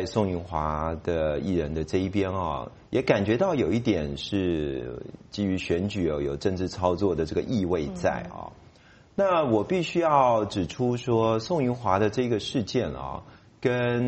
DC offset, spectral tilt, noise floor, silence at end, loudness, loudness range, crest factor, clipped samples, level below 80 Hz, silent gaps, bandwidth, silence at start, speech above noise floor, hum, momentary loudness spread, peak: under 0.1%; -6.5 dB/octave; -54 dBFS; 0 s; -26 LUFS; 3 LU; 20 dB; under 0.1%; -46 dBFS; none; 8.4 kHz; 0 s; 29 dB; none; 9 LU; -6 dBFS